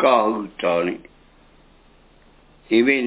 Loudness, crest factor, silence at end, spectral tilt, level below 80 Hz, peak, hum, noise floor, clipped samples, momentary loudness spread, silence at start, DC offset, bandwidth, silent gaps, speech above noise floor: -20 LUFS; 20 dB; 0 s; -9 dB/octave; -56 dBFS; -2 dBFS; none; -52 dBFS; under 0.1%; 9 LU; 0 s; under 0.1%; 4 kHz; none; 34 dB